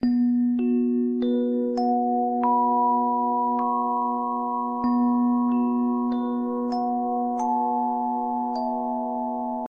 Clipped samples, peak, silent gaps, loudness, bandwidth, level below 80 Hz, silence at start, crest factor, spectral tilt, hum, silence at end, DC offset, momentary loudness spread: under 0.1%; -12 dBFS; none; -24 LUFS; 6.6 kHz; -64 dBFS; 0 s; 12 dB; -7.5 dB/octave; none; 0 s; under 0.1%; 5 LU